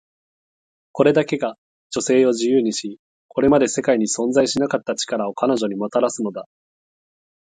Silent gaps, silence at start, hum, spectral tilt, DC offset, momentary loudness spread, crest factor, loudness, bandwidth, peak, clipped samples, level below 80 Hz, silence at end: 1.58-1.90 s, 2.99-3.29 s; 0.95 s; none; -4.5 dB/octave; under 0.1%; 11 LU; 18 dB; -20 LUFS; 9.6 kHz; -2 dBFS; under 0.1%; -58 dBFS; 1.15 s